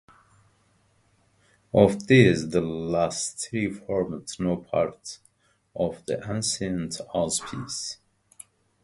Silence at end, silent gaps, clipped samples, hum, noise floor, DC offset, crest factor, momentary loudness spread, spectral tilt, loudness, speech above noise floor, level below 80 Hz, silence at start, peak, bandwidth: 0.9 s; none; under 0.1%; none; -65 dBFS; under 0.1%; 24 dB; 14 LU; -5 dB/octave; -25 LUFS; 40 dB; -54 dBFS; 1.75 s; -2 dBFS; 11.5 kHz